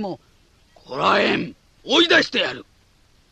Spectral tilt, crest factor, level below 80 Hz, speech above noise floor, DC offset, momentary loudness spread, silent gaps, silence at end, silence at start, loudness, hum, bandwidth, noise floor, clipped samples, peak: -3.5 dB/octave; 18 dB; -58 dBFS; 37 dB; under 0.1%; 22 LU; none; 0.7 s; 0 s; -18 LUFS; none; 9 kHz; -57 dBFS; under 0.1%; -4 dBFS